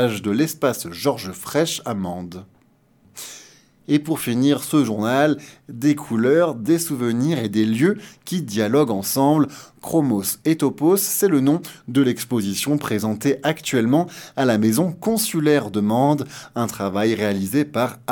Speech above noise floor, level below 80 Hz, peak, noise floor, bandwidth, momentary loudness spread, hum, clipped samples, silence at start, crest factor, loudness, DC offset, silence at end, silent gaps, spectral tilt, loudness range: 38 dB; -62 dBFS; -4 dBFS; -58 dBFS; 19 kHz; 10 LU; none; under 0.1%; 0 s; 16 dB; -20 LUFS; under 0.1%; 0 s; none; -5 dB/octave; 5 LU